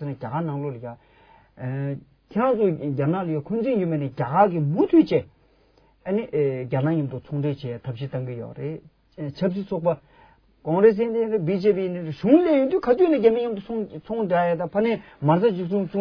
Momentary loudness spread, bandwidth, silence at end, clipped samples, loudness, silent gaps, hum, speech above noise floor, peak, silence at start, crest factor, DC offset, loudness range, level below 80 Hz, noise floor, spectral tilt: 14 LU; 5.4 kHz; 0 s; under 0.1%; -23 LUFS; none; none; 37 dB; -4 dBFS; 0 s; 20 dB; under 0.1%; 7 LU; -58 dBFS; -59 dBFS; -10.5 dB/octave